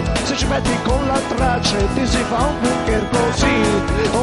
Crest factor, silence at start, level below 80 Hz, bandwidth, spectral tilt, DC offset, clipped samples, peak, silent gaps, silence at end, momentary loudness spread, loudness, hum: 16 dB; 0 s; -26 dBFS; 11.5 kHz; -5 dB/octave; under 0.1%; under 0.1%; -2 dBFS; none; 0 s; 3 LU; -18 LUFS; none